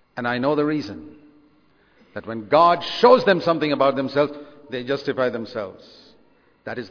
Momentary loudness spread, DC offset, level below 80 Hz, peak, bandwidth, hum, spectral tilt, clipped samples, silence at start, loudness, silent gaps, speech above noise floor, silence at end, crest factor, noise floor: 19 LU; under 0.1%; -62 dBFS; -2 dBFS; 5.4 kHz; none; -6.5 dB/octave; under 0.1%; 0.15 s; -20 LUFS; none; 38 dB; 0 s; 20 dB; -59 dBFS